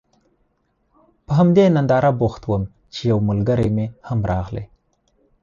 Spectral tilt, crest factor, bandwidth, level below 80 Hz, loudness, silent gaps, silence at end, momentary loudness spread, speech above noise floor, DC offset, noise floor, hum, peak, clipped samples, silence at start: -8.5 dB/octave; 16 dB; 7.4 kHz; -40 dBFS; -19 LUFS; none; 0.75 s; 11 LU; 49 dB; under 0.1%; -66 dBFS; none; -4 dBFS; under 0.1%; 1.3 s